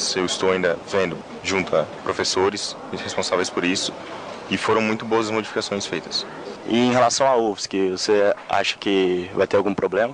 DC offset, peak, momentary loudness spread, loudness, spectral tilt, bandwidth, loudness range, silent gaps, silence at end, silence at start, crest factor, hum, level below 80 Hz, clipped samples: under 0.1%; -6 dBFS; 9 LU; -21 LUFS; -3.5 dB/octave; 10.5 kHz; 3 LU; none; 0 s; 0 s; 16 dB; none; -58 dBFS; under 0.1%